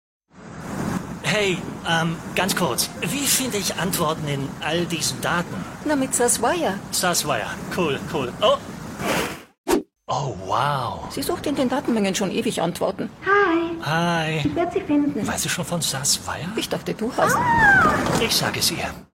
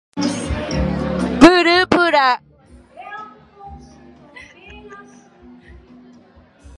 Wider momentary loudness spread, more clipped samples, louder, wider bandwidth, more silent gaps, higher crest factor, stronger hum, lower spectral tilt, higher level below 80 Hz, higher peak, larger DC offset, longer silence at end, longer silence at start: second, 9 LU vs 28 LU; neither; second, -22 LUFS vs -15 LUFS; first, 17 kHz vs 11.5 kHz; first, 9.58-9.64 s vs none; about the same, 18 dB vs 20 dB; neither; second, -3.5 dB/octave vs -5 dB/octave; second, -48 dBFS vs -36 dBFS; second, -4 dBFS vs 0 dBFS; neither; second, 0.1 s vs 1.8 s; first, 0.35 s vs 0.15 s